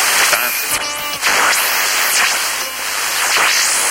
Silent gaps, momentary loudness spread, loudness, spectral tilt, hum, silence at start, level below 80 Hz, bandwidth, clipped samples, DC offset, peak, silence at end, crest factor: none; 6 LU; -13 LUFS; 2 dB/octave; none; 0 s; -50 dBFS; 16 kHz; under 0.1%; under 0.1%; 0 dBFS; 0 s; 14 dB